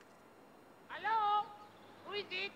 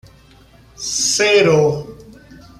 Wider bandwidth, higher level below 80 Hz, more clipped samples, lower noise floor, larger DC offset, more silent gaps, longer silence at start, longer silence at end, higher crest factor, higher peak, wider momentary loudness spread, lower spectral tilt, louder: about the same, 15 kHz vs 15 kHz; second, -84 dBFS vs -50 dBFS; neither; first, -61 dBFS vs -47 dBFS; neither; neither; second, 0 s vs 0.8 s; second, 0 s vs 0.5 s; about the same, 16 dB vs 16 dB; second, -24 dBFS vs -2 dBFS; first, 22 LU vs 16 LU; about the same, -3 dB/octave vs -3 dB/octave; second, -37 LUFS vs -14 LUFS